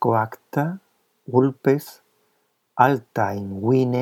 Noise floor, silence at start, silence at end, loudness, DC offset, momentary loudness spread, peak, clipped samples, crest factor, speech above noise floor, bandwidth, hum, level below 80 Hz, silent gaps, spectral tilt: -69 dBFS; 0 s; 0 s; -22 LUFS; under 0.1%; 10 LU; -2 dBFS; under 0.1%; 20 dB; 48 dB; 17 kHz; none; -74 dBFS; none; -8 dB/octave